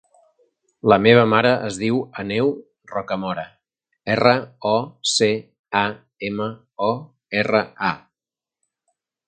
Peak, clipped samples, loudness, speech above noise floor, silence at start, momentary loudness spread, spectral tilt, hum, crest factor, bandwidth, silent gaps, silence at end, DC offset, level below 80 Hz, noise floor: 0 dBFS; under 0.1%; -20 LUFS; over 71 dB; 0.85 s; 15 LU; -4.5 dB/octave; none; 22 dB; 9.6 kHz; 5.59-5.64 s; 1.3 s; under 0.1%; -58 dBFS; under -90 dBFS